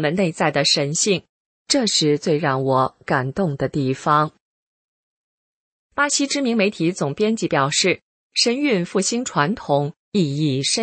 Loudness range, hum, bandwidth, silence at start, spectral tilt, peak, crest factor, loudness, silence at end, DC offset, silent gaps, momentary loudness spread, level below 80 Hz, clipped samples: 4 LU; none; 8.8 kHz; 0 s; -4 dB/octave; -2 dBFS; 18 dB; -20 LUFS; 0 s; under 0.1%; 1.29-1.65 s, 4.40-5.90 s, 8.02-8.30 s, 9.96-10.12 s; 5 LU; -58 dBFS; under 0.1%